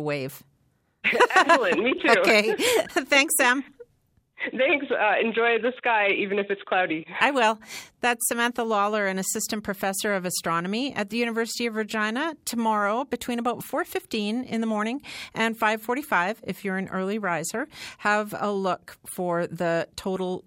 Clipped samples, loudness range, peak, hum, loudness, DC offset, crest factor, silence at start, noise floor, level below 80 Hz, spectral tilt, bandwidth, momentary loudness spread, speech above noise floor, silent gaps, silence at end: under 0.1%; 7 LU; -4 dBFS; none; -24 LUFS; under 0.1%; 22 dB; 0 s; -68 dBFS; -66 dBFS; -3 dB/octave; 17 kHz; 10 LU; 43 dB; none; 0.05 s